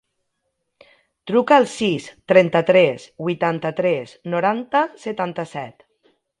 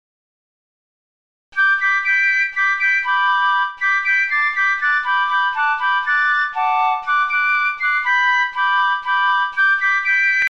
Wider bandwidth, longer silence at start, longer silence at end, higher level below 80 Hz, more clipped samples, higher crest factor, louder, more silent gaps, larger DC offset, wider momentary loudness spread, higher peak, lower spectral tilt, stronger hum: first, 11 kHz vs 8 kHz; second, 1.25 s vs 1.55 s; first, 0.7 s vs 0 s; about the same, -66 dBFS vs -66 dBFS; neither; first, 20 dB vs 10 dB; second, -19 LUFS vs -16 LUFS; neither; second, under 0.1% vs 0.5%; first, 13 LU vs 3 LU; first, 0 dBFS vs -6 dBFS; first, -6 dB/octave vs 1.5 dB/octave; neither